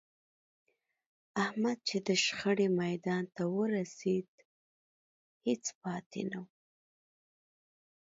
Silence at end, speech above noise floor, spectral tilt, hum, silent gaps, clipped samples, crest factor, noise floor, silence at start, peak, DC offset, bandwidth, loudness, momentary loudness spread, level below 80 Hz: 1.55 s; over 56 dB; -4.5 dB/octave; none; 4.28-4.38 s, 4.45-5.41 s, 5.75-5.81 s, 6.06-6.11 s; under 0.1%; 20 dB; under -90 dBFS; 1.35 s; -16 dBFS; under 0.1%; 8 kHz; -34 LUFS; 10 LU; -80 dBFS